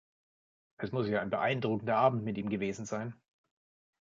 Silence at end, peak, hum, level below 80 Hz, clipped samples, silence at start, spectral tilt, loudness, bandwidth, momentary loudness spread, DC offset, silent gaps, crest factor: 0.9 s; -12 dBFS; none; -68 dBFS; under 0.1%; 0.8 s; -5.5 dB/octave; -33 LUFS; 7.6 kHz; 11 LU; under 0.1%; none; 22 dB